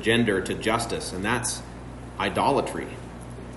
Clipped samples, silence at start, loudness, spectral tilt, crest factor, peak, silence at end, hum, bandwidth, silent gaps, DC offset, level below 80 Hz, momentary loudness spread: under 0.1%; 0 s; -26 LUFS; -4 dB/octave; 18 dB; -8 dBFS; 0 s; 60 Hz at -45 dBFS; 11.5 kHz; none; under 0.1%; -44 dBFS; 17 LU